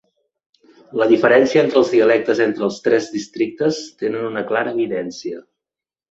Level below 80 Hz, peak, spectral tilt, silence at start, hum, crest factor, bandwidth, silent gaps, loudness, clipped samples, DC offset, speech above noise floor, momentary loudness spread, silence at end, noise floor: -62 dBFS; -2 dBFS; -5 dB/octave; 0.9 s; none; 16 dB; 8 kHz; none; -18 LUFS; under 0.1%; under 0.1%; 71 dB; 14 LU; 0.7 s; -88 dBFS